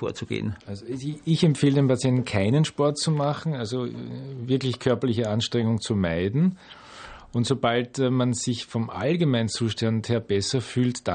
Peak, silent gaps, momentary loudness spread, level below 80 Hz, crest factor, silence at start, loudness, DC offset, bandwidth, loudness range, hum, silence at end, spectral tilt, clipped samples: -8 dBFS; none; 11 LU; -58 dBFS; 16 dB; 0 s; -25 LUFS; under 0.1%; 9.4 kHz; 2 LU; none; 0 s; -6 dB/octave; under 0.1%